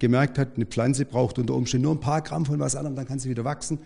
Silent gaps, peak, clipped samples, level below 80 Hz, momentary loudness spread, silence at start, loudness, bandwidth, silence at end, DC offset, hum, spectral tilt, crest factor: none; -8 dBFS; under 0.1%; -48 dBFS; 6 LU; 0 s; -25 LUFS; 10.5 kHz; 0 s; under 0.1%; none; -6 dB/octave; 16 dB